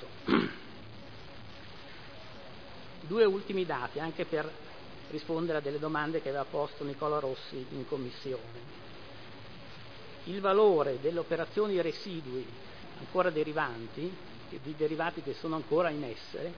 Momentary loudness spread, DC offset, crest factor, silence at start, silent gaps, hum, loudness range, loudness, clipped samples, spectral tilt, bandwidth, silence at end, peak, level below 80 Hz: 19 LU; 0.4%; 22 dB; 0 s; none; none; 6 LU; -33 LUFS; under 0.1%; -4.5 dB/octave; 5.4 kHz; 0 s; -12 dBFS; -64 dBFS